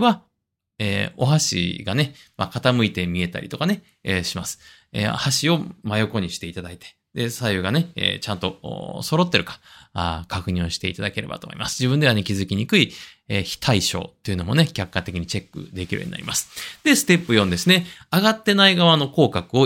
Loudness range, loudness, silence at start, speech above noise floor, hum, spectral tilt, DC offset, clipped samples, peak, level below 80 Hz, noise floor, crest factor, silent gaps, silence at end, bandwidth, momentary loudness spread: 6 LU; -21 LUFS; 0 s; 57 dB; none; -4.5 dB/octave; under 0.1%; under 0.1%; 0 dBFS; -52 dBFS; -79 dBFS; 22 dB; none; 0 s; 16.5 kHz; 13 LU